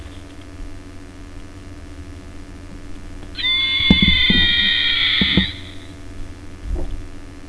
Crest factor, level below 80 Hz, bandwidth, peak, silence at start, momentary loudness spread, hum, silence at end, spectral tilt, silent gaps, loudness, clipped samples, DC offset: 20 dB; -30 dBFS; 11 kHz; 0 dBFS; 0 s; 26 LU; none; 0 s; -4.5 dB/octave; none; -14 LUFS; under 0.1%; 0.4%